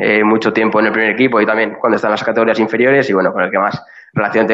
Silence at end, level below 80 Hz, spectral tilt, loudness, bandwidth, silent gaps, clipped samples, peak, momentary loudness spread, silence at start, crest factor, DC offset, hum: 0 s; -58 dBFS; -6.5 dB/octave; -13 LUFS; 7.8 kHz; none; under 0.1%; 0 dBFS; 5 LU; 0 s; 14 dB; under 0.1%; none